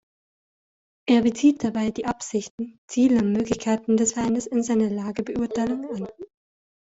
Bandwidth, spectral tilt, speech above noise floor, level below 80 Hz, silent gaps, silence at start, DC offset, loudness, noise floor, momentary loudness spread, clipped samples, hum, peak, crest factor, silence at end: 8 kHz; -5 dB/octave; over 67 dB; -56 dBFS; 2.50-2.58 s, 2.78-2.88 s; 1.05 s; under 0.1%; -23 LUFS; under -90 dBFS; 12 LU; under 0.1%; none; -8 dBFS; 16 dB; 0.65 s